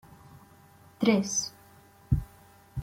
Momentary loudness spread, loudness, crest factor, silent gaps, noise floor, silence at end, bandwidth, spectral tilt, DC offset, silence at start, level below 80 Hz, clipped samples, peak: 16 LU; -29 LUFS; 20 dB; none; -56 dBFS; 0 s; 16.5 kHz; -4.5 dB/octave; under 0.1%; 0.35 s; -44 dBFS; under 0.1%; -10 dBFS